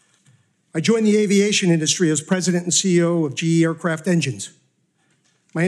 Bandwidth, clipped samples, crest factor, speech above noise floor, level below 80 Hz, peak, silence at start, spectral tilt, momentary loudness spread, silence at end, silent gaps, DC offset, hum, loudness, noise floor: 12.5 kHz; under 0.1%; 14 dB; 46 dB; -74 dBFS; -6 dBFS; 0.75 s; -4.5 dB/octave; 9 LU; 0 s; none; under 0.1%; none; -18 LUFS; -65 dBFS